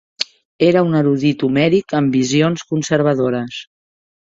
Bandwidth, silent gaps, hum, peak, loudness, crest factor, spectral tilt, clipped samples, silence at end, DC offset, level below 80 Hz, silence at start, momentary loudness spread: 7.8 kHz; 0.45-0.59 s; none; -2 dBFS; -16 LUFS; 16 dB; -6 dB/octave; under 0.1%; 0.7 s; under 0.1%; -56 dBFS; 0.2 s; 10 LU